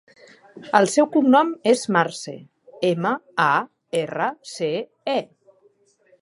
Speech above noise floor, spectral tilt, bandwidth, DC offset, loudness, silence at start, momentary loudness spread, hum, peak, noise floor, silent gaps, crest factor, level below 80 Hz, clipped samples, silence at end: 39 dB; -4.5 dB/octave; 11.5 kHz; under 0.1%; -21 LUFS; 0.55 s; 11 LU; none; -2 dBFS; -60 dBFS; none; 22 dB; -76 dBFS; under 0.1%; 1 s